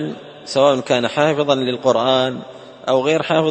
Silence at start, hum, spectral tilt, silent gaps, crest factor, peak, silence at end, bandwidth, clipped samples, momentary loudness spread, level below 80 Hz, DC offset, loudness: 0 s; none; -5 dB/octave; none; 16 dB; 0 dBFS; 0 s; 8.8 kHz; under 0.1%; 13 LU; -60 dBFS; under 0.1%; -17 LUFS